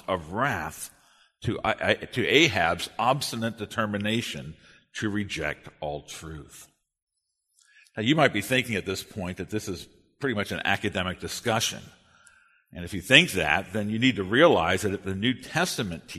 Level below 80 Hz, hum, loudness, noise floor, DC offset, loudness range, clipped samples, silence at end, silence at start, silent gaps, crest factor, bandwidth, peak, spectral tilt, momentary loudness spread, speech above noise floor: -54 dBFS; none; -25 LUFS; -77 dBFS; under 0.1%; 10 LU; under 0.1%; 0 s; 0.1 s; 7.02-7.07 s; 28 dB; 13.5 kHz; 0 dBFS; -4 dB/octave; 17 LU; 51 dB